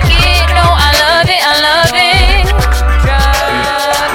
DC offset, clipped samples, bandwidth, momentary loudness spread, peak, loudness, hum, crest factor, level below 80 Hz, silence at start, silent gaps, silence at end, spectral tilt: under 0.1%; 0.1%; 17.5 kHz; 4 LU; 0 dBFS; -9 LUFS; none; 8 dB; -14 dBFS; 0 s; none; 0 s; -3.5 dB/octave